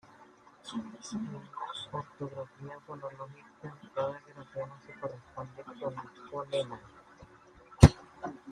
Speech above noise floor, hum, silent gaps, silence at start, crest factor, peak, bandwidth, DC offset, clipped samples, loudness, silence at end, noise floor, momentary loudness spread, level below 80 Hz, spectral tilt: 18 dB; none; none; 0.2 s; 32 dB; -2 dBFS; 12 kHz; under 0.1%; under 0.1%; -33 LUFS; 0 s; -58 dBFS; 18 LU; -44 dBFS; -6.5 dB/octave